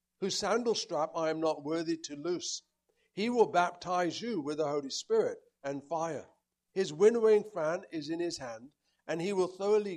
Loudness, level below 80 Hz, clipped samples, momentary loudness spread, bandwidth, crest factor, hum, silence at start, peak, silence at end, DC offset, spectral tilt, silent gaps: -32 LUFS; -76 dBFS; under 0.1%; 13 LU; 11 kHz; 20 dB; none; 0.2 s; -12 dBFS; 0 s; under 0.1%; -4 dB/octave; none